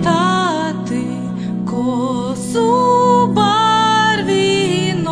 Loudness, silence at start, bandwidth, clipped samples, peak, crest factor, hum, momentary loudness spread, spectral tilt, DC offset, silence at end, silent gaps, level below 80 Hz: -15 LUFS; 0 s; 11 kHz; under 0.1%; -2 dBFS; 14 dB; none; 9 LU; -5 dB/octave; under 0.1%; 0 s; none; -50 dBFS